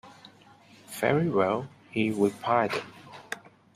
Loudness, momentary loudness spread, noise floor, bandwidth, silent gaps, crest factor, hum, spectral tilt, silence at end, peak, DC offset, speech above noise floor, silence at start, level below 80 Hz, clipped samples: -27 LUFS; 16 LU; -55 dBFS; 15.5 kHz; none; 20 dB; none; -6 dB/octave; 0.4 s; -10 dBFS; under 0.1%; 29 dB; 0.05 s; -68 dBFS; under 0.1%